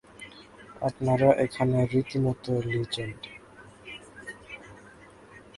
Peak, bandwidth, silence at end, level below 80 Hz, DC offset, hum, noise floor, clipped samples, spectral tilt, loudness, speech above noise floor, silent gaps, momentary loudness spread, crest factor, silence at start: -6 dBFS; 11.5 kHz; 0.15 s; -56 dBFS; under 0.1%; none; -51 dBFS; under 0.1%; -7 dB/octave; -27 LUFS; 26 dB; none; 24 LU; 22 dB; 0.2 s